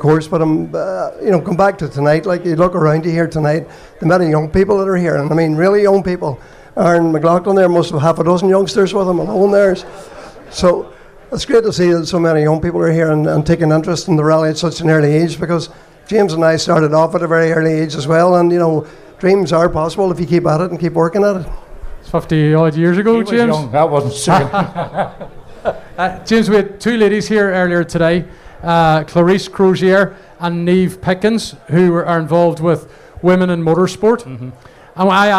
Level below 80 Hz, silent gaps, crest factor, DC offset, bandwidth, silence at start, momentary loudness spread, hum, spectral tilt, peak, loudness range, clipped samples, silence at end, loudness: -38 dBFS; none; 12 dB; under 0.1%; 13 kHz; 0 s; 9 LU; none; -6.5 dB/octave; -2 dBFS; 2 LU; under 0.1%; 0 s; -14 LUFS